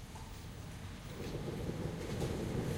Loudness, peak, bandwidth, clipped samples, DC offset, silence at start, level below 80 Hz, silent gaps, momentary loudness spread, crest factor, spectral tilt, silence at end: -42 LUFS; -24 dBFS; 16.5 kHz; under 0.1%; under 0.1%; 0 s; -52 dBFS; none; 10 LU; 16 dB; -6 dB/octave; 0 s